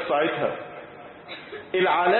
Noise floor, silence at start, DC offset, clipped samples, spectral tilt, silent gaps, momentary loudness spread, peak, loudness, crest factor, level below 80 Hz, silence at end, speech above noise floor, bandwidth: -43 dBFS; 0 s; under 0.1%; under 0.1%; -9 dB/octave; none; 19 LU; -8 dBFS; -25 LUFS; 16 dB; -66 dBFS; 0 s; 21 dB; 4.3 kHz